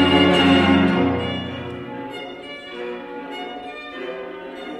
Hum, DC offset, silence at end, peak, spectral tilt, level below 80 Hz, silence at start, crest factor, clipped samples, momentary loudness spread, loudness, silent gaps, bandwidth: none; under 0.1%; 0 s; -2 dBFS; -6 dB/octave; -50 dBFS; 0 s; 18 dB; under 0.1%; 19 LU; -19 LUFS; none; 10.5 kHz